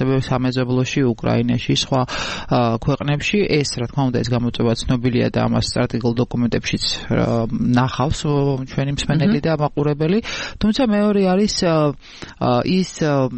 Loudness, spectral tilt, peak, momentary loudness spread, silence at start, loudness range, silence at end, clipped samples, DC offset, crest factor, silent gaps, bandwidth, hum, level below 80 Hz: -19 LUFS; -6 dB/octave; -4 dBFS; 4 LU; 0 s; 1 LU; 0 s; under 0.1%; under 0.1%; 14 dB; none; 8.8 kHz; none; -38 dBFS